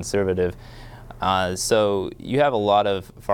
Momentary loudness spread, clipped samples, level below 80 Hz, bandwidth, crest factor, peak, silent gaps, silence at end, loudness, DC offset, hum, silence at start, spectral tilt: 22 LU; under 0.1%; -46 dBFS; 18.5 kHz; 16 dB; -6 dBFS; none; 0 s; -22 LUFS; under 0.1%; none; 0 s; -4.5 dB/octave